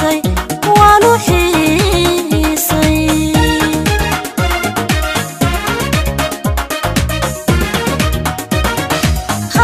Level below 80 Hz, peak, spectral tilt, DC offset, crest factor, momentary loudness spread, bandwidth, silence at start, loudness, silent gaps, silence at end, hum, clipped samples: -22 dBFS; 0 dBFS; -4.5 dB/octave; under 0.1%; 12 dB; 7 LU; 16 kHz; 0 s; -13 LUFS; none; 0 s; none; under 0.1%